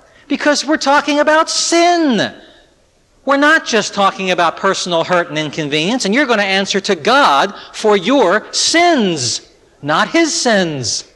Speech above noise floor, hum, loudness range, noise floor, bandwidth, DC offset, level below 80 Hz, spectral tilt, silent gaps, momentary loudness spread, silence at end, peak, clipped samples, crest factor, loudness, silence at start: 39 dB; none; 2 LU; -53 dBFS; 12 kHz; under 0.1%; -56 dBFS; -3 dB/octave; none; 8 LU; 0.15 s; -2 dBFS; under 0.1%; 12 dB; -13 LUFS; 0.3 s